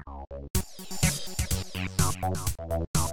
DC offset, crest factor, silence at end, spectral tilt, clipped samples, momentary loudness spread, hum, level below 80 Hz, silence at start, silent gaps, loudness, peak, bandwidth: under 0.1%; 18 dB; 0 s; -4 dB/octave; under 0.1%; 7 LU; none; -38 dBFS; 0 s; 0.50-0.54 s, 2.87-2.94 s; -30 LUFS; -10 dBFS; over 20 kHz